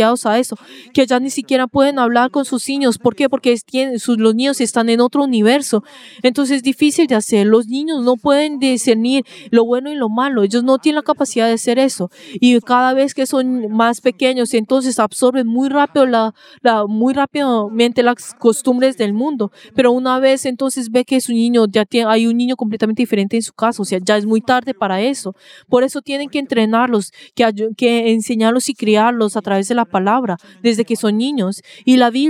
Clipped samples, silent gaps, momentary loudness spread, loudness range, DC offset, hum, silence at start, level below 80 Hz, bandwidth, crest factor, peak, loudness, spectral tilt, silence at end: under 0.1%; none; 6 LU; 2 LU; under 0.1%; none; 0 s; -64 dBFS; 15.5 kHz; 14 dB; 0 dBFS; -15 LUFS; -4.5 dB/octave; 0 s